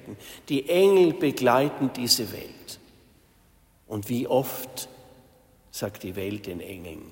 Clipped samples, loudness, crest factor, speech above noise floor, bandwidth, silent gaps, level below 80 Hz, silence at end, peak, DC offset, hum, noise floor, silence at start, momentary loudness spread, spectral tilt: under 0.1%; -24 LUFS; 20 dB; 34 dB; 16.5 kHz; none; -62 dBFS; 0 s; -8 dBFS; under 0.1%; none; -60 dBFS; 0.05 s; 21 LU; -4.5 dB/octave